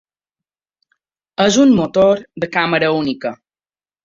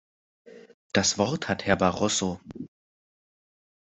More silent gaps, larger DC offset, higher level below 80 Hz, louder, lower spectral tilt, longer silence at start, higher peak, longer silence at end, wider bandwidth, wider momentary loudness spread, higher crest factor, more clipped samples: second, none vs 0.74-0.90 s; neither; first, -54 dBFS vs -60 dBFS; first, -15 LUFS vs -25 LUFS; about the same, -4.5 dB/octave vs -3.5 dB/octave; first, 1.4 s vs 0.45 s; first, -2 dBFS vs -6 dBFS; second, 0.7 s vs 1.25 s; about the same, 7.6 kHz vs 8.2 kHz; second, 12 LU vs 19 LU; second, 16 dB vs 24 dB; neither